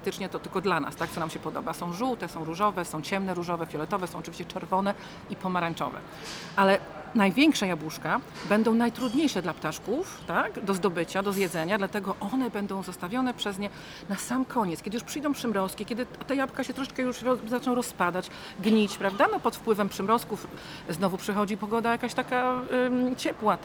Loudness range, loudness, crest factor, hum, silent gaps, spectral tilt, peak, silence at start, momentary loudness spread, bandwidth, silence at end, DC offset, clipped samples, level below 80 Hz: 5 LU; -29 LUFS; 20 dB; none; none; -5 dB/octave; -8 dBFS; 0 s; 10 LU; over 20 kHz; 0 s; under 0.1%; under 0.1%; -60 dBFS